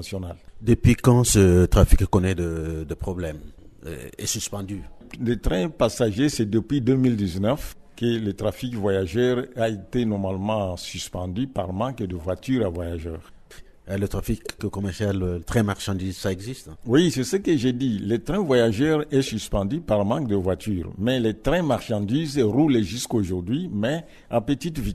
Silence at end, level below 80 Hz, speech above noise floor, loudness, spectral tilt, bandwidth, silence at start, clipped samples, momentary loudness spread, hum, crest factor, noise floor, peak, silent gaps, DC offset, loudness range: 0 s; -34 dBFS; 23 dB; -24 LUFS; -6 dB/octave; 13.5 kHz; 0 s; under 0.1%; 12 LU; none; 22 dB; -45 dBFS; 0 dBFS; none; under 0.1%; 7 LU